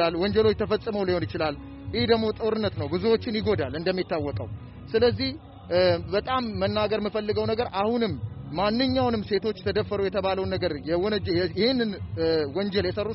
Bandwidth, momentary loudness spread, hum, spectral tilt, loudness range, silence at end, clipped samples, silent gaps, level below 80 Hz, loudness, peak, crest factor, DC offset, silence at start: 5.8 kHz; 6 LU; none; -4.5 dB/octave; 1 LU; 0 s; under 0.1%; none; -46 dBFS; -26 LUFS; -8 dBFS; 18 dB; under 0.1%; 0 s